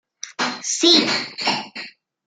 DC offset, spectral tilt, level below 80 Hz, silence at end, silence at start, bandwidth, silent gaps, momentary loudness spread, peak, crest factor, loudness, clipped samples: under 0.1%; -1.5 dB/octave; -74 dBFS; 0.35 s; 0.25 s; 9.6 kHz; none; 21 LU; 0 dBFS; 22 dB; -18 LUFS; under 0.1%